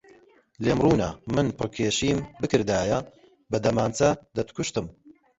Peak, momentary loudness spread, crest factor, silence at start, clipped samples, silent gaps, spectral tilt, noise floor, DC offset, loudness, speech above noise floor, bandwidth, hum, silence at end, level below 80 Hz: -6 dBFS; 8 LU; 20 dB; 0.6 s; under 0.1%; none; -5.5 dB/octave; -56 dBFS; under 0.1%; -25 LUFS; 31 dB; 8.2 kHz; none; 0.25 s; -48 dBFS